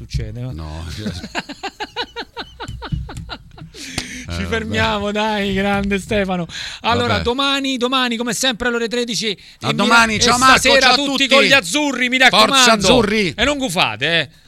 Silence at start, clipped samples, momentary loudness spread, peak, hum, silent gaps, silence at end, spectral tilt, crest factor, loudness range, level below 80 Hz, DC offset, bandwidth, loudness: 0 s; under 0.1%; 18 LU; 0 dBFS; none; none; 0.2 s; -3 dB/octave; 18 dB; 16 LU; -36 dBFS; under 0.1%; 16.5 kHz; -15 LUFS